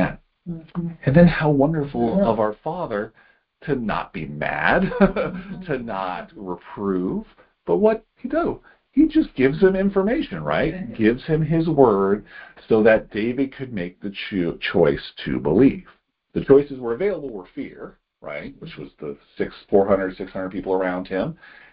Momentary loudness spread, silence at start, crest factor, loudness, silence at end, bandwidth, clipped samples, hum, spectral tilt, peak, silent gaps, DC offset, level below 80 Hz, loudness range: 18 LU; 0 s; 20 dB; -21 LUFS; 0.4 s; 5.4 kHz; under 0.1%; none; -12 dB/octave; 0 dBFS; none; under 0.1%; -44 dBFS; 5 LU